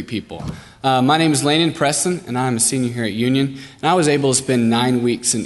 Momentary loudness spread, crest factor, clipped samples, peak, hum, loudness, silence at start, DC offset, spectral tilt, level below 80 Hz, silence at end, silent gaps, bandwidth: 9 LU; 16 dB; under 0.1%; -2 dBFS; none; -17 LUFS; 0 s; under 0.1%; -4 dB/octave; -50 dBFS; 0 s; none; 12 kHz